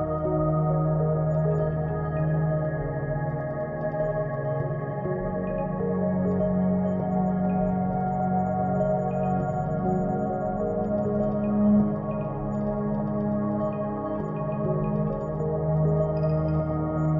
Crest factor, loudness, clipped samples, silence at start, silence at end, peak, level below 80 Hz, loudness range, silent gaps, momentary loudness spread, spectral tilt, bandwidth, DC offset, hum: 14 dB; -26 LUFS; under 0.1%; 0 s; 0 s; -12 dBFS; -44 dBFS; 3 LU; none; 5 LU; -12 dB/octave; 3.3 kHz; under 0.1%; none